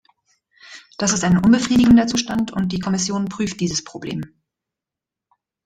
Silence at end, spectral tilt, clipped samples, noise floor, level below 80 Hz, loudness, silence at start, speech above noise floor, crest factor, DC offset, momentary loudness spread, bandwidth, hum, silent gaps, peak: 1.4 s; -4.5 dB/octave; under 0.1%; -87 dBFS; -46 dBFS; -18 LUFS; 0.7 s; 69 dB; 16 dB; under 0.1%; 16 LU; 9.6 kHz; none; none; -4 dBFS